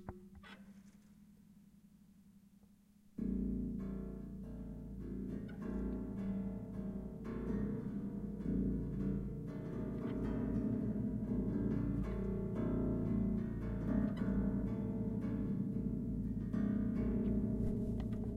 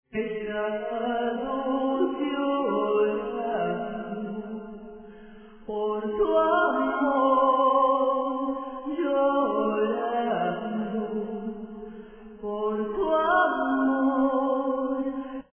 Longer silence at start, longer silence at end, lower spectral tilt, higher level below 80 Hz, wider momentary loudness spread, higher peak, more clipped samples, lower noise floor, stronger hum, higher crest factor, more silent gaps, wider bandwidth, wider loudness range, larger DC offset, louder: second, 0 s vs 0.15 s; second, 0 s vs 0.15 s; about the same, -10.5 dB/octave vs -9.5 dB/octave; first, -48 dBFS vs -58 dBFS; second, 10 LU vs 14 LU; second, -24 dBFS vs -10 dBFS; neither; first, -66 dBFS vs -47 dBFS; neither; about the same, 16 dB vs 16 dB; neither; first, 6.2 kHz vs 3.5 kHz; about the same, 7 LU vs 6 LU; neither; second, -40 LUFS vs -26 LUFS